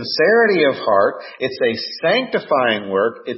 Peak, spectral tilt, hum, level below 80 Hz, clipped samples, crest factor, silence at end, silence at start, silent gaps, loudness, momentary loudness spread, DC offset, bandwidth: -2 dBFS; -7.5 dB/octave; none; -68 dBFS; under 0.1%; 16 dB; 0 s; 0 s; none; -17 LUFS; 7 LU; under 0.1%; 5.8 kHz